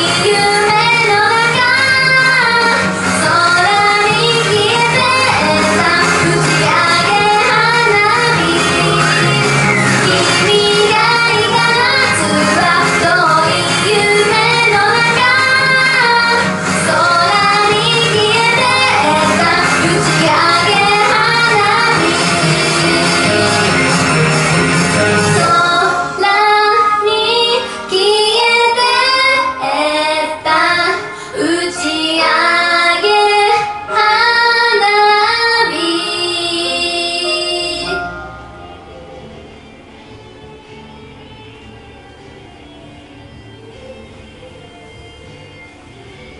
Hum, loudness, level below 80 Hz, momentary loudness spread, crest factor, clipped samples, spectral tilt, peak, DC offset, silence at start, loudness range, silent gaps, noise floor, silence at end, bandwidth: none; -10 LUFS; -44 dBFS; 5 LU; 12 dB; under 0.1%; -3 dB/octave; 0 dBFS; under 0.1%; 0 s; 3 LU; none; -36 dBFS; 0 s; 11.5 kHz